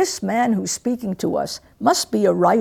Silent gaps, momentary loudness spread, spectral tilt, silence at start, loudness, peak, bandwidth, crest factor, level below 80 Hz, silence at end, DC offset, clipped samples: none; 7 LU; -4.5 dB/octave; 0 s; -20 LUFS; -4 dBFS; 18.5 kHz; 16 dB; -58 dBFS; 0 s; under 0.1%; under 0.1%